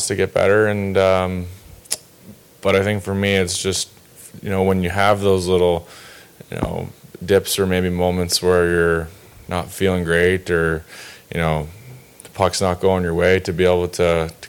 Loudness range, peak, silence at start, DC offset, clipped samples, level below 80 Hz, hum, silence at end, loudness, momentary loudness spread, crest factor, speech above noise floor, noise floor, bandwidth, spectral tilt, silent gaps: 3 LU; -2 dBFS; 0 s; under 0.1%; under 0.1%; -42 dBFS; none; 0 s; -19 LUFS; 13 LU; 16 dB; 26 dB; -44 dBFS; 19 kHz; -4.5 dB/octave; none